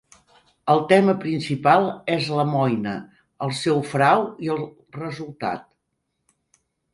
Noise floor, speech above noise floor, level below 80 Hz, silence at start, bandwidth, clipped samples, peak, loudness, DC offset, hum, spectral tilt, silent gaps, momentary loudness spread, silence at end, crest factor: -76 dBFS; 55 dB; -64 dBFS; 0.65 s; 11.5 kHz; under 0.1%; -2 dBFS; -22 LUFS; under 0.1%; none; -6.5 dB/octave; none; 15 LU; 1.3 s; 20 dB